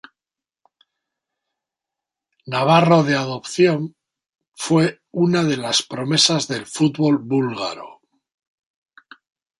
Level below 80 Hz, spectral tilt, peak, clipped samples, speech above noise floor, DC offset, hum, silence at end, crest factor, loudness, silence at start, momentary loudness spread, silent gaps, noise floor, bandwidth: -64 dBFS; -4.5 dB/octave; -2 dBFS; under 0.1%; 71 dB; under 0.1%; none; 1.7 s; 20 dB; -18 LUFS; 2.45 s; 11 LU; 4.29-4.39 s, 4.48-4.52 s; -90 dBFS; 11.5 kHz